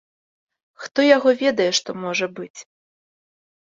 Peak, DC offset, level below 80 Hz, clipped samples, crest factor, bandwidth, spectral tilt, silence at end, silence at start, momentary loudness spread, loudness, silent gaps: -2 dBFS; under 0.1%; -72 dBFS; under 0.1%; 20 dB; 7.6 kHz; -3 dB/octave; 1.15 s; 0.8 s; 20 LU; -19 LUFS; 0.91-0.95 s, 2.50-2.54 s